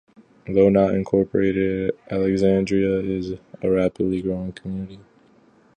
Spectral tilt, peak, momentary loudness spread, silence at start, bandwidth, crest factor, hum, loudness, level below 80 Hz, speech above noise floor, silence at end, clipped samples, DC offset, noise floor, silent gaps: -8.5 dB/octave; -4 dBFS; 14 LU; 0.45 s; 9.2 kHz; 18 dB; none; -21 LUFS; -48 dBFS; 35 dB; 0.75 s; under 0.1%; under 0.1%; -55 dBFS; none